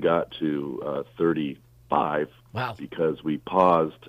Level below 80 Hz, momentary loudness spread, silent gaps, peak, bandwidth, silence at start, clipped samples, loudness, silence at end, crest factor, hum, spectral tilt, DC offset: -60 dBFS; 11 LU; none; -6 dBFS; 15 kHz; 0 s; under 0.1%; -26 LUFS; 0 s; 20 dB; none; -8 dB/octave; under 0.1%